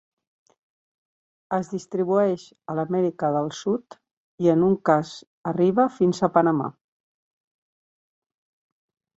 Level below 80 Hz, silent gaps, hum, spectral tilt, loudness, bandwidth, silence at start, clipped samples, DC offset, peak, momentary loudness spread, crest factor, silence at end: -66 dBFS; 4.13-4.38 s, 5.27-5.44 s; none; -7.5 dB/octave; -23 LUFS; 8 kHz; 1.5 s; under 0.1%; under 0.1%; -4 dBFS; 10 LU; 20 dB; 2.45 s